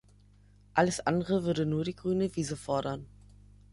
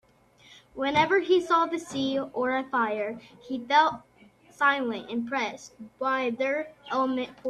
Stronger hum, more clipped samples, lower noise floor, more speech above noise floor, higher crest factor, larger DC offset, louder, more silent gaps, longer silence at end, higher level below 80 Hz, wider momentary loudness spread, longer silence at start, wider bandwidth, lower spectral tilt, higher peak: first, 50 Hz at -50 dBFS vs none; neither; about the same, -59 dBFS vs -58 dBFS; about the same, 30 dB vs 31 dB; about the same, 22 dB vs 18 dB; neither; second, -31 LUFS vs -27 LUFS; neither; first, 0.65 s vs 0 s; first, -56 dBFS vs -68 dBFS; second, 6 LU vs 14 LU; first, 0.75 s vs 0.5 s; about the same, 11.5 kHz vs 12 kHz; first, -6 dB/octave vs -4 dB/octave; about the same, -10 dBFS vs -8 dBFS